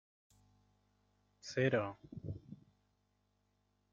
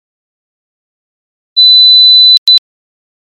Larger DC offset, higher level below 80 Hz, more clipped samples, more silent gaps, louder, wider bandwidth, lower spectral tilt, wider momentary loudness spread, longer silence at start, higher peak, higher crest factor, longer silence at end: neither; about the same, -72 dBFS vs -74 dBFS; second, under 0.1% vs 0.1%; second, none vs 2.38-2.46 s; second, -38 LUFS vs -2 LUFS; second, 7.6 kHz vs 13.5 kHz; first, -6 dB/octave vs 4 dB/octave; first, 22 LU vs 7 LU; about the same, 1.45 s vs 1.55 s; second, -20 dBFS vs 0 dBFS; first, 24 dB vs 10 dB; first, 1.35 s vs 0.8 s